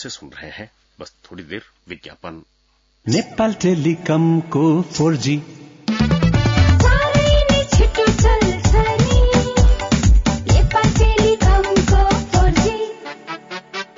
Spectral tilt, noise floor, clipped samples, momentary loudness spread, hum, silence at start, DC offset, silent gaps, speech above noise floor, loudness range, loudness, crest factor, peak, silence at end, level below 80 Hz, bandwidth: -5.5 dB/octave; -60 dBFS; under 0.1%; 18 LU; none; 0 s; under 0.1%; none; 40 dB; 8 LU; -16 LUFS; 12 dB; -4 dBFS; 0.15 s; -20 dBFS; 7.6 kHz